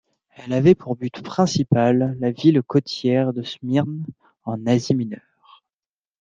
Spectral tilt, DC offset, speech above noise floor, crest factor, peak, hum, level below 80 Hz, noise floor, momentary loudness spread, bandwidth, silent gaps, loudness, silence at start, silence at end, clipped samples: -7 dB/octave; under 0.1%; over 70 dB; 18 dB; -2 dBFS; none; -58 dBFS; under -90 dBFS; 14 LU; 7.6 kHz; none; -21 LUFS; 0.4 s; 1.05 s; under 0.1%